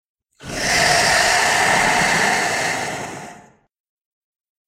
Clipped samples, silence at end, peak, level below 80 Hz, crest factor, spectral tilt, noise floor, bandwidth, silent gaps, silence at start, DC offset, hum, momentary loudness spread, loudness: under 0.1%; 1.25 s; -2 dBFS; -46 dBFS; 18 dB; -1.5 dB/octave; -46 dBFS; 16 kHz; none; 0.4 s; under 0.1%; none; 15 LU; -16 LUFS